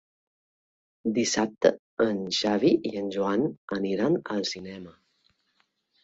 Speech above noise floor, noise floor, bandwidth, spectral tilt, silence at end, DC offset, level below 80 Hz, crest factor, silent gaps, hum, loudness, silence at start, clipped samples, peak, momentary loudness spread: 46 dB; -72 dBFS; 8.2 kHz; -4.5 dB/octave; 1.1 s; under 0.1%; -66 dBFS; 22 dB; 1.79-1.97 s, 3.57-3.68 s; none; -27 LUFS; 1.05 s; under 0.1%; -6 dBFS; 9 LU